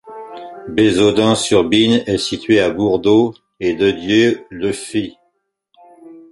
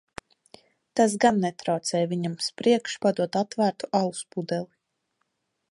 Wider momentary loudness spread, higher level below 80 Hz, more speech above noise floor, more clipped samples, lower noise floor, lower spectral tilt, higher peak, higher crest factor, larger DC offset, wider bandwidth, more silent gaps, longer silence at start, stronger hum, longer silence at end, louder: about the same, 10 LU vs 10 LU; first, -48 dBFS vs -70 dBFS; about the same, 53 dB vs 52 dB; neither; second, -67 dBFS vs -77 dBFS; about the same, -5 dB/octave vs -5 dB/octave; first, 0 dBFS vs -6 dBFS; about the same, 16 dB vs 20 dB; neither; about the same, 11.5 kHz vs 11.5 kHz; neither; second, 0.05 s vs 0.95 s; neither; second, 0.1 s vs 1.05 s; first, -15 LUFS vs -26 LUFS